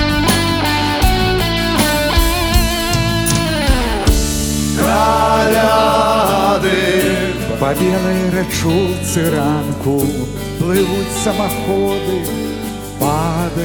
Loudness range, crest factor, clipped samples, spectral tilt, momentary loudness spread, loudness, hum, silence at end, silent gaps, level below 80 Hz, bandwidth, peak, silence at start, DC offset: 4 LU; 14 dB; under 0.1%; -4.5 dB/octave; 6 LU; -15 LUFS; none; 0 s; none; -24 dBFS; over 20 kHz; 0 dBFS; 0 s; under 0.1%